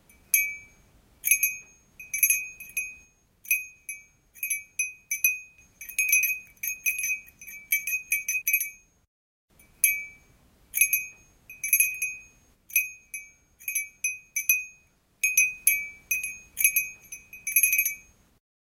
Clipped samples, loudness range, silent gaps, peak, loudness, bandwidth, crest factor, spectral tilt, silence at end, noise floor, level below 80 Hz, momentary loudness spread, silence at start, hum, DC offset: under 0.1%; 4 LU; 9.08-9.48 s; -4 dBFS; -25 LUFS; 17 kHz; 26 dB; 3 dB/octave; 0.65 s; -62 dBFS; -66 dBFS; 18 LU; 0.35 s; none; under 0.1%